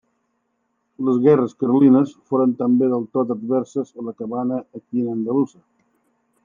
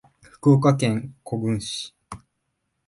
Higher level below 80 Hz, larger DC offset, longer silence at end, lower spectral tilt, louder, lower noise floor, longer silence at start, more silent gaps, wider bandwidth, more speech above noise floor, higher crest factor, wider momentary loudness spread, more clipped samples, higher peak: second, -74 dBFS vs -56 dBFS; neither; first, 0.95 s vs 0.7 s; first, -9.5 dB/octave vs -6.5 dB/octave; about the same, -20 LUFS vs -22 LUFS; second, -71 dBFS vs -76 dBFS; first, 1 s vs 0.45 s; neither; second, 7.2 kHz vs 11.5 kHz; about the same, 52 dB vs 55 dB; about the same, 18 dB vs 18 dB; second, 12 LU vs 25 LU; neither; first, -2 dBFS vs -6 dBFS